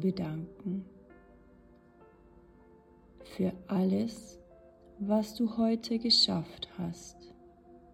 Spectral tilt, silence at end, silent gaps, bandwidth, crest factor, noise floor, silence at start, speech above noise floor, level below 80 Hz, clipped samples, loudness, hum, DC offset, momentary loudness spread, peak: -5.5 dB/octave; 0.15 s; none; 14 kHz; 20 dB; -59 dBFS; 0 s; 27 dB; -62 dBFS; under 0.1%; -31 LUFS; 50 Hz at -65 dBFS; under 0.1%; 23 LU; -14 dBFS